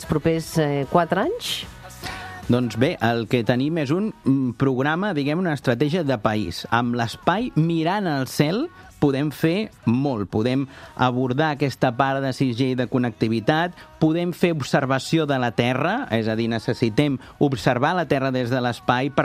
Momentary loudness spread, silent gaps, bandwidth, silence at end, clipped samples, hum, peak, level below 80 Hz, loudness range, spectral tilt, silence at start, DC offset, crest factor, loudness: 4 LU; none; 15 kHz; 0 s; under 0.1%; none; -2 dBFS; -50 dBFS; 1 LU; -6.5 dB/octave; 0 s; under 0.1%; 20 dB; -22 LUFS